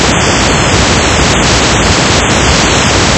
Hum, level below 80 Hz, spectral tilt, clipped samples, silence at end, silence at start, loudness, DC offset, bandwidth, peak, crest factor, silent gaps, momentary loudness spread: none; -18 dBFS; -3 dB/octave; 1%; 0 s; 0 s; -7 LUFS; under 0.1%; 11 kHz; 0 dBFS; 8 dB; none; 1 LU